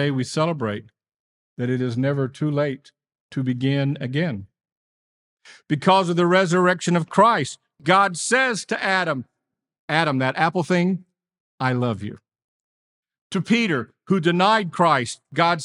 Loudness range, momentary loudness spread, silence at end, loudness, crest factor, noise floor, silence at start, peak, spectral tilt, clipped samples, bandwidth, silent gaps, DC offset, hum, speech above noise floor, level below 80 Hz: 7 LU; 11 LU; 0 s; -21 LUFS; 20 dB; under -90 dBFS; 0 s; -2 dBFS; -5.5 dB/octave; under 0.1%; 11.5 kHz; 1.16-1.56 s, 3.20-3.29 s, 4.72-5.37 s, 9.79-9.88 s, 11.40-11.58 s, 12.44-13.03 s, 13.21-13.30 s; under 0.1%; none; over 69 dB; -70 dBFS